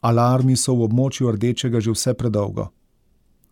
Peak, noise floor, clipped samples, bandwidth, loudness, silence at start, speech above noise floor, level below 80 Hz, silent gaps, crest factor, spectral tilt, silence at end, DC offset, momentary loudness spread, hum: -8 dBFS; -60 dBFS; under 0.1%; 16 kHz; -20 LUFS; 0.05 s; 41 dB; -50 dBFS; none; 12 dB; -6 dB/octave; 0.85 s; under 0.1%; 8 LU; none